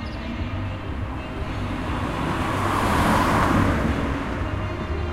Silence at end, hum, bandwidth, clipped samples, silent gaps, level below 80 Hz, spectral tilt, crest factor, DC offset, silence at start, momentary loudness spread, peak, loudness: 0 s; none; 16 kHz; under 0.1%; none; -32 dBFS; -6 dB/octave; 16 dB; under 0.1%; 0 s; 11 LU; -6 dBFS; -24 LUFS